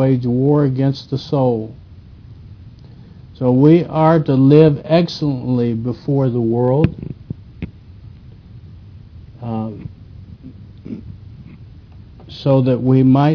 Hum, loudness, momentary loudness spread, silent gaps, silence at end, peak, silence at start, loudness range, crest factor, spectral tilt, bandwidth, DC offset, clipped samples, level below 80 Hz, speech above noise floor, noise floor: none; -15 LUFS; 22 LU; none; 0 s; 0 dBFS; 0 s; 17 LU; 16 dB; -9.5 dB/octave; 5.4 kHz; under 0.1%; under 0.1%; -44 dBFS; 25 dB; -39 dBFS